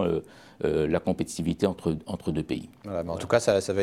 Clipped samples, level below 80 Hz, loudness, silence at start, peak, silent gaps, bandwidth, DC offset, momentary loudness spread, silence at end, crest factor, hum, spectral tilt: under 0.1%; -52 dBFS; -28 LUFS; 0 s; -8 dBFS; none; 15 kHz; under 0.1%; 9 LU; 0 s; 20 dB; none; -6 dB/octave